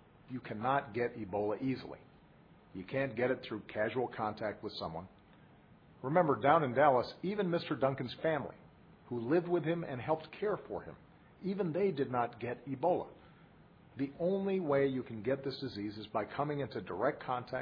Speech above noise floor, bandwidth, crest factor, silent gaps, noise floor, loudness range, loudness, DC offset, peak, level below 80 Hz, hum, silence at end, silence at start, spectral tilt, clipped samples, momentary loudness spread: 26 dB; 5.2 kHz; 22 dB; none; -61 dBFS; 6 LU; -35 LUFS; under 0.1%; -14 dBFS; -70 dBFS; none; 0 s; 0.25 s; -5.5 dB/octave; under 0.1%; 14 LU